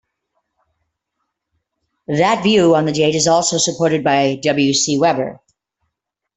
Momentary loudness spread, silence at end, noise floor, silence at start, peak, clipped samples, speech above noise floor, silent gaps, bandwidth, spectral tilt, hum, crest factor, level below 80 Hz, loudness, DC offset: 4 LU; 1.05 s; -77 dBFS; 2.1 s; -2 dBFS; under 0.1%; 62 dB; none; 8.4 kHz; -4 dB/octave; none; 16 dB; -56 dBFS; -15 LUFS; under 0.1%